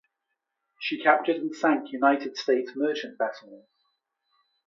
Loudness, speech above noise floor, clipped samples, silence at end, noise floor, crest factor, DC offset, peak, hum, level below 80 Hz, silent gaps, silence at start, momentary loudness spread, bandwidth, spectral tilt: -26 LUFS; 57 dB; under 0.1%; 1.1 s; -82 dBFS; 22 dB; under 0.1%; -6 dBFS; none; -86 dBFS; none; 0.8 s; 9 LU; 7.6 kHz; -4 dB/octave